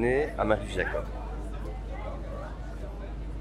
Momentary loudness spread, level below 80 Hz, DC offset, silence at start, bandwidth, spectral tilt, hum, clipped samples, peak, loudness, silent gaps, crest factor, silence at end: 12 LU; -36 dBFS; under 0.1%; 0 s; 11 kHz; -6.5 dB/octave; none; under 0.1%; -12 dBFS; -33 LUFS; none; 20 dB; 0 s